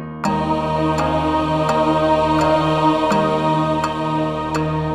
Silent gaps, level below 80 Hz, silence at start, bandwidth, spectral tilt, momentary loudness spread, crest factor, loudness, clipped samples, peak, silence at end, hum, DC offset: none; -38 dBFS; 0 s; 13 kHz; -6.5 dB/octave; 5 LU; 12 dB; -18 LUFS; under 0.1%; -4 dBFS; 0 s; none; under 0.1%